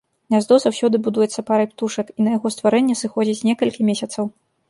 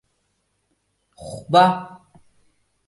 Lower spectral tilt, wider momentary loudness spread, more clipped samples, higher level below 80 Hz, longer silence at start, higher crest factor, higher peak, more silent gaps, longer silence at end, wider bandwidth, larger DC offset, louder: about the same, -5 dB/octave vs -5.5 dB/octave; second, 8 LU vs 25 LU; neither; second, -66 dBFS vs -60 dBFS; second, 0.3 s vs 1.2 s; second, 16 dB vs 22 dB; about the same, -2 dBFS vs -2 dBFS; neither; second, 0.4 s vs 1 s; about the same, 11.5 kHz vs 11.5 kHz; neither; about the same, -19 LUFS vs -18 LUFS